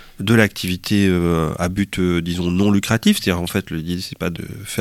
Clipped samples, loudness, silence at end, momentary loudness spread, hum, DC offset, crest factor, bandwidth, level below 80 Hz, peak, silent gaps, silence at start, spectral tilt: under 0.1%; -19 LUFS; 0 s; 10 LU; none; under 0.1%; 18 dB; 16.5 kHz; -40 dBFS; 0 dBFS; none; 0 s; -5.5 dB/octave